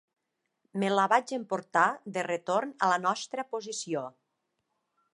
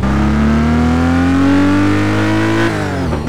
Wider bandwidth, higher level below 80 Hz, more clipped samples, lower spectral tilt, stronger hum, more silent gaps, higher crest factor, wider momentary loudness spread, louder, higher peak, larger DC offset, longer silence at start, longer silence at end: second, 11.5 kHz vs 13 kHz; second, -86 dBFS vs -24 dBFS; neither; second, -4 dB/octave vs -7 dB/octave; neither; neither; first, 22 dB vs 10 dB; first, 10 LU vs 4 LU; second, -29 LUFS vs -13 LUFS; second, -10 dBFS vs -2 dBFS; second, under 0.1% vs 4%; first, 0.75 s vs 0 s; first, 1.05 s vs 0 s